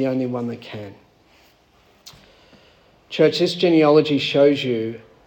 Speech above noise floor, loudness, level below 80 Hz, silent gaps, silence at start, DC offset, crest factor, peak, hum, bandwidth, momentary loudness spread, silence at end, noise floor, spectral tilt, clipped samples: 38 dB; -18 LUFS; -64 dBFS; none; 0 s; under 0.1%; 18 dB; -2 dBFS; none; 17 kHz; 18 LU; 0.3 s; -56 dBFS; -6 dB/octave; under 0.1%